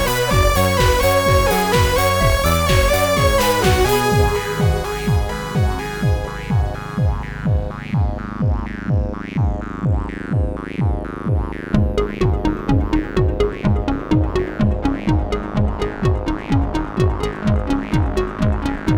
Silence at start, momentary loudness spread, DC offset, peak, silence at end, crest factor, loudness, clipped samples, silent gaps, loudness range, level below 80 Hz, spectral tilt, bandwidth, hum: 0 s; 7 LU; under 0.1%; -2 dBFS; 0 s; 16 dB; -19 LUFS; under 0.1%; none; 6 LU; -24 dBFS; -5.5 dB/octave; over 20 kHz; none